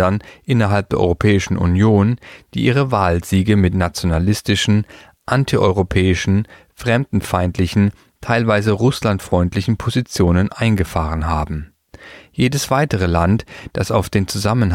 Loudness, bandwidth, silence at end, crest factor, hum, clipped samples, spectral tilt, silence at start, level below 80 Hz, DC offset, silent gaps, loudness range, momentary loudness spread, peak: -17 LUFS; 16 kHz; 0 s; 16 dB; none; under 0.1%; -6 dB/octave; 0 s; -34 dBFS; under 0.1%; none; 3 LU; 6 LU; -2 dBFS